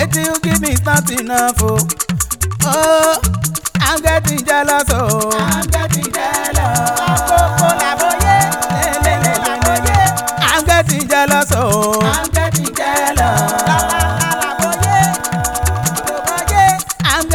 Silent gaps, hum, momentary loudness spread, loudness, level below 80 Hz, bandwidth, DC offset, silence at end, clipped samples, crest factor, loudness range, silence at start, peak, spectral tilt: none; none; 5 LU; -14 LUFS; -26 dBFS; 20 kHz; under 0.1%; 0 s; under 0.1%; 14 dB; 1 LU; 0 s; 0 dBFS; -3.5 dB/octave